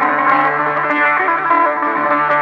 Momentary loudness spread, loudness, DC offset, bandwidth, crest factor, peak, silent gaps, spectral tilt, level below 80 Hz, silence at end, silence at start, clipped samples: 2 LU; -14 LUFS; under 0.1%; 6.4 kHz; 14 dB; -2 dBFS; none; -6.5 dB/octave; -74 dBFS; 0 s; 0 s; under 0.1%